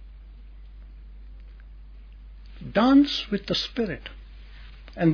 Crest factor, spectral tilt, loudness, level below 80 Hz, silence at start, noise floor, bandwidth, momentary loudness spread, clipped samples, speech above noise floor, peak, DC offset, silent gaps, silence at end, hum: 18 dB; -6.5 dB/octave; -23 LUFS; -44 dBFS; 0 s; -44 dBFS; 5.4 kHz; 29 LU; under 0.1%; 21 dB; -8 dBFS; under 0.1%; none; 0 s; none